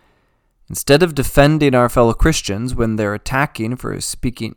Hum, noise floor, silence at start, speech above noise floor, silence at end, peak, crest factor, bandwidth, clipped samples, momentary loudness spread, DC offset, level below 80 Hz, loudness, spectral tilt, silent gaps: none; -61 dBFS; 0.7 s; 45 dB; 0.05 s; 0 dBFS; 16 dB; 19 kHz; under 0.1%; 10 LU; under 0.1%; -28 dBFS; -16 LUFS; -5 dB/octave; none